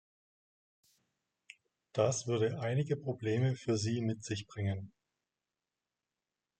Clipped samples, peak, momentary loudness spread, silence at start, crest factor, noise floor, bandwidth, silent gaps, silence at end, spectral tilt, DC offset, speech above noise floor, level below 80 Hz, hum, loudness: under 0.1%; -18 dBFS; 8 LU; 1.95 s; 20 dB; under -90 dBFS; 9.2 kHz; none; 1.7 s; -6 dB/octave; under 0.1%; over 56 dB; -74 dBFS; none; -35 LUFS